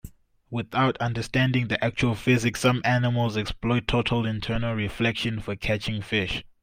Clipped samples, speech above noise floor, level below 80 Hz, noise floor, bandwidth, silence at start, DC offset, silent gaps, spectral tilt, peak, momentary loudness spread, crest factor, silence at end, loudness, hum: under 0.1%; 21 dB; -44 dBFS; -46 dBFS; 16 kHz; 0.05 s; under 0.1%; none; -6 dB/octave; -8 dBFS; 6 LU; 18 dB; 0.15 s; -25 LUFS; none